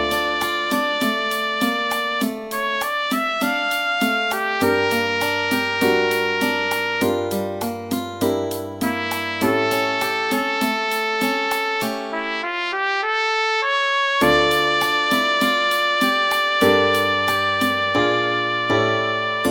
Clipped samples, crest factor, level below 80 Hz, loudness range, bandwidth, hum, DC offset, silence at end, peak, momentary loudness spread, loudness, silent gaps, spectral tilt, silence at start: under 0.1%; 18 dB; -54 dBFS; 4 LU; 17 kHz; none; under 0.1%; 0 s; -2 dBFS; 6 LU; -20 LUFS; none; -3.5 dB/octave; 0 s